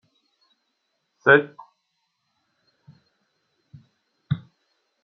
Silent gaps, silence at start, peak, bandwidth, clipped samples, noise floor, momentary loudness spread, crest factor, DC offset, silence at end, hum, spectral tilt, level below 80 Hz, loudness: none; 1.25 s; -2 dBFS; 6 kHz; under 0.1%; -75 dBFS; 15 LU; 26 dB; under 0.1%; 0.65 s; none; -4 dB/octave; -68 dBFS; -21 LUFS